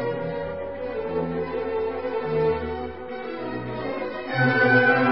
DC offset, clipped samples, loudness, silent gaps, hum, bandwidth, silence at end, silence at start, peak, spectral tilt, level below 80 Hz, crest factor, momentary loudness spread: 0.4%; under 0.1%; -25 LUFS; none; none; 5.8 kHz; 0 s; 0 s; -6 dBFS; -10.5 dB/octave; -48 dBFS; 18 dB; 14 LU